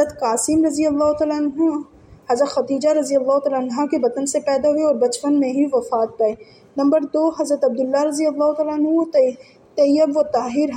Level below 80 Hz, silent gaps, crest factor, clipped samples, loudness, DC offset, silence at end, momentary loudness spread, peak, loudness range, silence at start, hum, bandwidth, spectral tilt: -58 dBFS; none; 14 dB; under 0.1%; -19 LUFS; under 0.1%; 0 s; 4 LU; -4 dBFS; 1 LU; 0 s; none; 15 kHz; -4 dB/octave